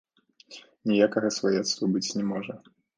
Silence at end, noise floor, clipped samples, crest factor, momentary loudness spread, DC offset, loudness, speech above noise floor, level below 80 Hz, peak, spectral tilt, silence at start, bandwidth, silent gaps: 0.4 s; -53 dBFS; under 0.1%; 20 dB; 23 LU; under 0.1%; -26 LUFS; 27 dB; -72 dBFS; -8 dBFS; -4.5 dB/octave; 0.5 s; 10 kHz; none